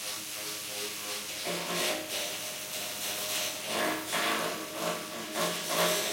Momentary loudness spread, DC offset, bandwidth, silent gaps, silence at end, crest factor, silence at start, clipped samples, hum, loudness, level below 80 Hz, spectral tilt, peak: 6 LU; under 0.1%; 16.5 kHz; none; 0 s; 18 dB; 0 s; under 0.1%; none; -32 LUFS; -74 dBFS; -1.5 dB/octave; -16 dBFS